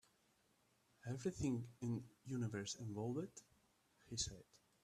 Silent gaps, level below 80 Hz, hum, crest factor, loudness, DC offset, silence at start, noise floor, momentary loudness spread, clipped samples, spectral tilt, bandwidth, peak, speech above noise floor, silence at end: none; -70 dBFS; none; 18 dB; -46 LUFS; under 0.1%; 1.05 s; -78 dBFS; 10 LU; under 0.1%; -5 dB/octave; 14 kHz; -30 dBFS; 33 dB; 0.25 s